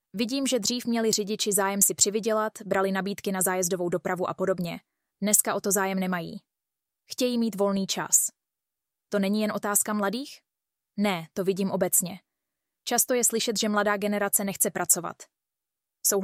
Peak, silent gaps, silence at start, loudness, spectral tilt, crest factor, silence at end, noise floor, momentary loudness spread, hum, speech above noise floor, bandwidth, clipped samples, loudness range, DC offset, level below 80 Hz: -6 dBFS; none; 0.15 s; -25 LUFS; -3 dB/octave; 22 dB; 0 s; -88 dBFS; 10 LU; none; 62 dB; 16 kHz; under 0.1%; 3 LU; under 0.1%; -70 dBFS